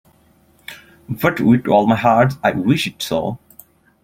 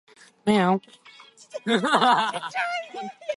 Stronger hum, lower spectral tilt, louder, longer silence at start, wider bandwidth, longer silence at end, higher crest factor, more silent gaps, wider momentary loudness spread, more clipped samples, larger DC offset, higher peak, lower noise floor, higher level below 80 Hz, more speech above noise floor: neither; first, -6.5 dB/octave vs -5 dB/octave; first, -16 LUFS vs -23 LUFS; first, 0.7 s vs 0.45 s; first, 16.5 kHz vs 11.5 kHz; first, 0.65 s vs 0 s; about the same, 18 dB vs 22 dB; neither; first, 21 LU vs 15 LU; neither; neither; about the same, 0 dBFS vs -2 dBFS; first, -54 dBFS vs -50 dBFS; first, -50 dBFS vs -68 dBFS; first, 38 dB vs 27 dB